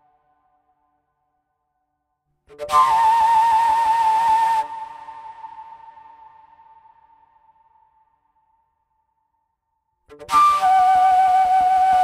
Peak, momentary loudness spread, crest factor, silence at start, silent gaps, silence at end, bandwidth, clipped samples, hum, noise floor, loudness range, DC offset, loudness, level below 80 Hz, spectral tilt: -6 dBFS; 23 LU; 14 dB; 2.6 s; none; 0 s; 15 kHz; under 0.1%; none; -74 dBFS; 8 LU; under 0.1%; -16 LUFS; -58 dBFS; -1.5 dB/octave